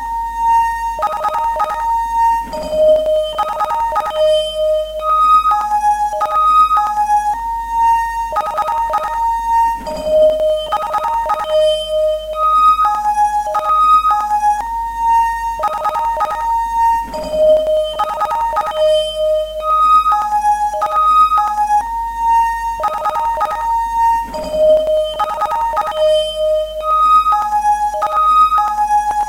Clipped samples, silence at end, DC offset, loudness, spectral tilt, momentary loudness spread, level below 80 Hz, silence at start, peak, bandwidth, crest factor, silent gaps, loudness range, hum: under 0.1%; 0 s; under 0.1%; -14 LUFS; -3 dB/octave; 8 LU; -38 dBFS; 0 s; -2 dBFS; 16.5 kHz; 12 dB; none; 3 LU; none